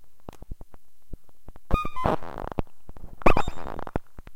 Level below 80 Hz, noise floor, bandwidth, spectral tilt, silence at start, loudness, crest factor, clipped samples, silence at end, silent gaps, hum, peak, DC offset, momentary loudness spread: -34 dBFS; -48 dBFS; 7.8 kHz; -7 dB/octave; 0 s; -29 LUFS; 22 dB; under 0.1%; 0.05 s; none; none; -4 dBFS; 1%; 25 LU